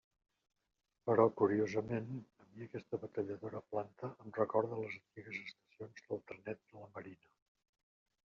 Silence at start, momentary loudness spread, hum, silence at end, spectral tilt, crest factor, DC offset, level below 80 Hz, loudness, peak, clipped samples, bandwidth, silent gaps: 1.05 s; 21 LU; none; 1.1 s; -6.5 dB/octave; 24 dB; under 0.1%; -80 dBFS; -39 LUFS; -16 dBFS; under 0.1%; 7 kHz; none